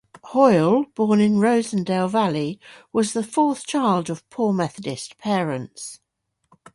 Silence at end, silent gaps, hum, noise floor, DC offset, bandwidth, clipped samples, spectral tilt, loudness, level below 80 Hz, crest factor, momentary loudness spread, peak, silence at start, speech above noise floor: 0.8 s; none; none; -74 dBFS; under 0.1%; 11.5 kHz; under 0.1%; -6 dB/octave; -21 LUFS; -64 dBFS; 18 dB; 14 LU; -4 dBFS; 0.25 s; 54 dB